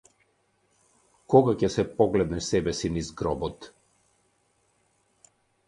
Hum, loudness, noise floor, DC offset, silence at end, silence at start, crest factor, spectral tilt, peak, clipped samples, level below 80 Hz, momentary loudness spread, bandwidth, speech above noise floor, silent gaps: none; -25 LUFS; -69 dBFS; under 0.1%; 2 s; 1.3 s; 24 dB; -6 dB/octave; -4 dBFS; under 0.1%; -50 dBFS; 11 LU; 11 kHz; 45 dB; none